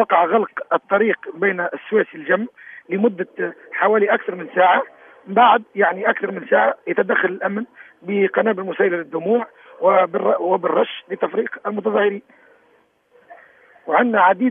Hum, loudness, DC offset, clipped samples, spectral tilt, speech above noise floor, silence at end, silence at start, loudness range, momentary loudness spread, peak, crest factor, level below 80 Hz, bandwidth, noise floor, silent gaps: none; -19 LUFS; under 0.1%; under 0.1%; -9 dB/octave; 40 dB; 0 s; 0 s; 4 LU; 10 LU; -2 dBFS; 18 dB; -80 dBFS; 3.7 kHz; -58 dBFS; none